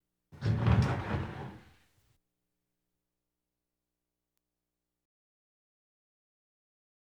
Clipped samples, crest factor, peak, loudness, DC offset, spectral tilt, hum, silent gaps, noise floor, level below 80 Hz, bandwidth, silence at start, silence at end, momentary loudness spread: under 0.1%; 24 dB; -14 dBFS; -32 LUFS; under 0.1%; -8 dB/octave; 60 Hz at -80 dBFS; none; -89 dBFS; -50 dBFS; 8.8 kHz; 0.35 s; 5.45 s; 16 LU